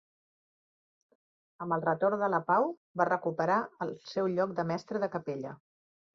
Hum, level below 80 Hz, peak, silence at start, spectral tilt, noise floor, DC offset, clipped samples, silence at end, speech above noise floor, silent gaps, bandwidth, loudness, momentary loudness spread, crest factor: none; -76 dBFS; -12 dBFS; 1.6 s; -7.5 dB/octave; under -90 dBFS; under 0.1%; under 0.1%; 0.6 s; over 59 dB; 2.77-2.95 s; 7.4 kHz; -31 LUFS; 10 LU; 22 dB